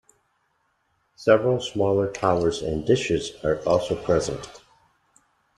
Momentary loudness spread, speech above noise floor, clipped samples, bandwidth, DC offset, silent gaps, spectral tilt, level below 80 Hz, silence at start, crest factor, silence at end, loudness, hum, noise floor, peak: 8 LU; 47 dB; under 0.1%; 12 kHz; under 0.1%; none; -5.5 dB/octave; -50 dBFS; 1.2 s; 20 dB; 1 s; -23 LUFS; none; -70 dBFS; -4 dBFS